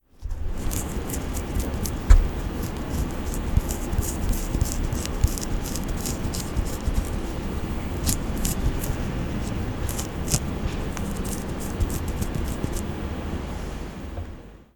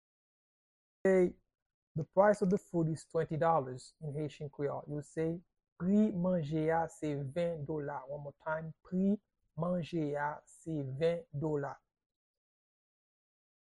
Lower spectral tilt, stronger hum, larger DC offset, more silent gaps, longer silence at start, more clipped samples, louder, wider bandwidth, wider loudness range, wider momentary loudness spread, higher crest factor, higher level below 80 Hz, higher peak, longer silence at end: second, -5 dB/octave vs -8 dB/octave; neither; neither; second, none vs 1.62-1.95 s, 5.72-5.76 s; second, 0.2 s vs 1.05 s; neither; first, -28 LUFS vs -35 LUFS; first, 18.5 kHz vs 11 kHz; about the same, 3 LU vs 5 LU; second, 6 LU vs 13 LU; first, 26 dB vs 20 dB; first, -28 dBFS vs -68 dBFS; first, 0 dBFS vs -14 dBFS; second, 0.15 s vs 1.95 s